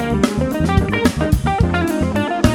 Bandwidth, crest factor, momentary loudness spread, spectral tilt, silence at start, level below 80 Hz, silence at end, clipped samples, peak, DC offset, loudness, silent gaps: 18 kHz; 16 dB; 2 LU; -6.5 dB/octave; 0 s; -26 dBFS; 0 s; under 0.1%; -2 dBFS; under 0.1%; -17 LUFS; none